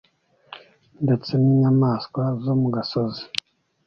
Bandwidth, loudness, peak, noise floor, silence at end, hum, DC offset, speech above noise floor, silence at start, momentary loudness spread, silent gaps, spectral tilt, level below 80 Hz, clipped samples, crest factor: 7 kHz; -22 LUFS; 0 dBFS; -47 dBFS; 0.6 s; none; under 0.1%; 26 dB; 0.5 s; 25 LU; none; -8 dB/octave; -58 dBFS; under 0.1%; 22 dB